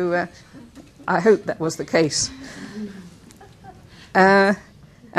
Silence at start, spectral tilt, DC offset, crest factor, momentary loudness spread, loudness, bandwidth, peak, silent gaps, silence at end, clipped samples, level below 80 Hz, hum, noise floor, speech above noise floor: 0 s; -4 dB/octave; under 0.1%; 20 dB; 20 LU; -19 LUFS; 13.5 kHz; -2 dBFS; none; 0 s; under 0.1%; -54 dBFS; none; -46 dBFS; 27 dB